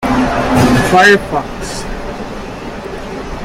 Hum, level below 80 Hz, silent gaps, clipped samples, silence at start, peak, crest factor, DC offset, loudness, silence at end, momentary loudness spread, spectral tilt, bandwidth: none; -28 dBFS; none; under 0.1%; 0 s; 0 dBFS; 14 dB; under 0.1%; -11 LUFS; 0 s; 17 LU; -5 dB/octave; 16.5 kHz